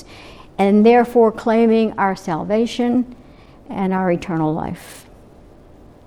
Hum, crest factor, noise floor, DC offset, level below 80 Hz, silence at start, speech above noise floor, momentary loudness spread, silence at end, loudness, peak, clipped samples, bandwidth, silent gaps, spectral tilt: none; 16 dB; -44 dBFS; under 0.1%; -48 dBFS; 0.1 s; 28 dB; 17 LU; 1.05 s; -17 LUFS; -2 dBFS; under 0.1%; 13.5 kHz; none; -7 dB/octave